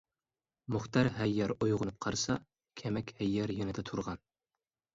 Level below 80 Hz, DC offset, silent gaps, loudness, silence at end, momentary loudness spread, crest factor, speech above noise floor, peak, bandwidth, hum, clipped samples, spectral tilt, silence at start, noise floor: -58 dBFS; under 0.1%; none; -35 LUFS; 0.8 s; 12 LU; 22 dB; over 56 dB; -14 dBFS; 7.8 kHz; none; under 0.1%; -5.5 dB/octave; 0.7 s; under -90 dBFS